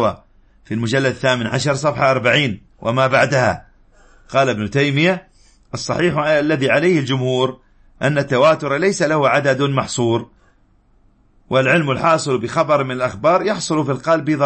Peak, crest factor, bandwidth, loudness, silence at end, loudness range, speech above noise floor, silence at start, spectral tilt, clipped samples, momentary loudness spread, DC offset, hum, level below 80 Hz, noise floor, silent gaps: -2 dBFS; 16 dB; 8.8 kHz; -17 LUFS; 0 s; 2 LU; 38 dB; 0 s; -5.5 dB/octave; under 0.1%; 8 LU; under 0.1%; none; -50 dBFS; -54 dBFS; none